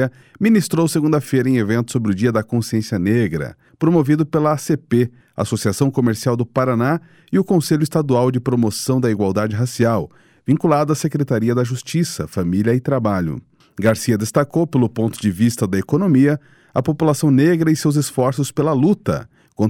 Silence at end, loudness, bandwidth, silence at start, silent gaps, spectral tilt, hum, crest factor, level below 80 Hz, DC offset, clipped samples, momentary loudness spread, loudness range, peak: 0 s; -18 LUFS; 17 kHz; 0 s; none; -6.5 dB/octave; none; 14 dB; -52 dBFS; under 0.1%; under 0.1%; 7 LU; 2 LU; -4 dBFS